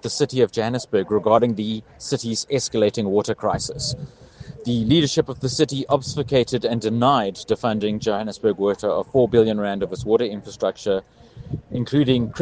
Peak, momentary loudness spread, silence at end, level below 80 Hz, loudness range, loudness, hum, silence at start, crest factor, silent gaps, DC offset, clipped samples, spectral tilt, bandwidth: -2 dBFS; 9 LU; 0 s; -50 dBFS; 2 LU; -21 LUFS; none; 0.05 s; 18 dB; none; under 0.1%; under 0.1%; -5.5 dB/octave; 9.8 kHz